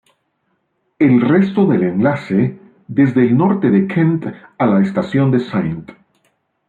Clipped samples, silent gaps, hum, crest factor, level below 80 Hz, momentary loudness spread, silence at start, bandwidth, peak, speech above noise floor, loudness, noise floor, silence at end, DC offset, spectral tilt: under 0.1%; none; none; 14 dB; -56 dBFS; 9 LU; 1 s; 7.2 kHz; -2 dBFS; 53 dB; -15 LUFS; -67 dBFS; 0.75 s; under 0.1%; -10 dB/octave